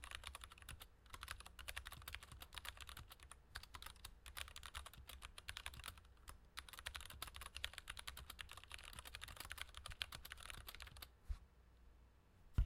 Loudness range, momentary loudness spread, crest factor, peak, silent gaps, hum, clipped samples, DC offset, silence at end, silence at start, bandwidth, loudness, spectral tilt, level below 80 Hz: 3 LU; 8 LU; 32 dB; -20 dBFS; none; none; under 0.1%; under 0.1%; 0 s; 0 s; 16.5 kHz; -54 LUFS; -2 dB/octave; -58 dBFS